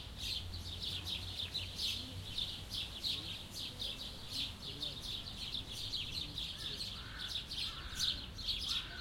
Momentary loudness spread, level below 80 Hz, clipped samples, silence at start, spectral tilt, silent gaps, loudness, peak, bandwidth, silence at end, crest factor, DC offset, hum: 6 LU; -54 dBFS; under 0.1%; 0 s; -2 dB/octave; none; -40 LUFS; -24 dBFS; 16.5 kHz; 0 s; 18 dB; under 0.1%; none